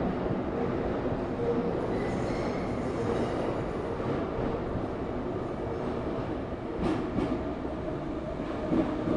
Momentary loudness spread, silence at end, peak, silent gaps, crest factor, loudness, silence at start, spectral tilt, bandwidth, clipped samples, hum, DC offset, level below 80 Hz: 5 LU; 0 s; -14 dBFS; none; 16 dB; -32 LUFS; 0 s; -8 dB/octave; 11 kHz; under 0.1%; none; under 0.1%; -44 dBFS